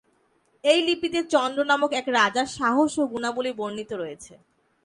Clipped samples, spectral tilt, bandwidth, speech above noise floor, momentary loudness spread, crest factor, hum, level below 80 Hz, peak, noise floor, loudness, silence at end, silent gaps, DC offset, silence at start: under 0.1%; -3 dB/octave; 11.5 kHz; 42 dB; 11 LU; 18 dB; none; -64 dBFS; -6 dBFS; -66 dBFS; -24 LUFS; 0.5 s; none; under 0.1%; 0.65 s